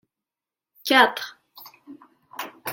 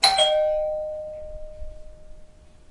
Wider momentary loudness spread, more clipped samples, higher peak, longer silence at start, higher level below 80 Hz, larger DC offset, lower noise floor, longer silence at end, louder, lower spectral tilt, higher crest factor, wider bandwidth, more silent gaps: second, 20 LU vs 24 LU; neither; about the same, -2 dBFS vs -2 dBFS; first, 0.85 s vs 0 s; second, -76 dBFS vs -44 dBFS; neither; first, -90 dBFS vs -47 dBFS; second, 0 s vs 0.25 s; about the same, -20 LUFS vs -22 LUFS; first, -1.5 dB/octave vs 0 dB/octave; about the same, 24 dB vs 24 dB; first, 17 kHz vs 11.5 kHz; neither